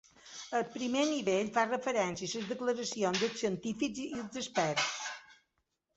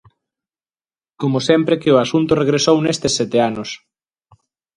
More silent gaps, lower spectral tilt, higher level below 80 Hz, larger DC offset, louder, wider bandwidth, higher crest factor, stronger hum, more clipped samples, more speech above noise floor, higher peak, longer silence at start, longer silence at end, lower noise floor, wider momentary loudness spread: neither; second, -3 dB/octave vs -5 dB/octave; second, -72 dBFS vs -52 dBFS; neither; second, -34 LUFS vs -16 LUFS; second, 8 kHz vs 11 kHz; about the same, 20 dB vs 18 dB; neither; neither; second, 48 dB vs over 74 dB; second, -14 dBFS vs 0 dBFS; second, 0.25 s vs 1.2 s; second, 0.65 s vs 1 s; second, -82 dBFS vs under -90 dBFS; about the same, 9 LU vs 10 LU